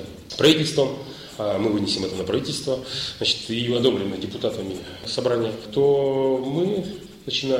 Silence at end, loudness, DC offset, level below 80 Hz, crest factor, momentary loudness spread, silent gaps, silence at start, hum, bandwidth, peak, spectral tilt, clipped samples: 0 s; -23 LUFS; under 0.1%; -54 dBFS; 18 dB; 11 LU; none; 0 s; none; 16 kHz; -4 dBFS; -5 dB/octave; under 0.1%